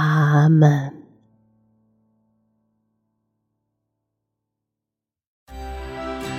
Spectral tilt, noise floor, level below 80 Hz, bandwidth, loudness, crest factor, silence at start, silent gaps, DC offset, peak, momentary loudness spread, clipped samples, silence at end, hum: -8 dB/octave; -87 dBFS; -46 dBFS; 8.4 kHz; -17 LUFS; 20 dB; 0 s; 5.27-5.46 s; under 0.1%; -2 dBFS; 20 LU; under 0.1%; 0 s; none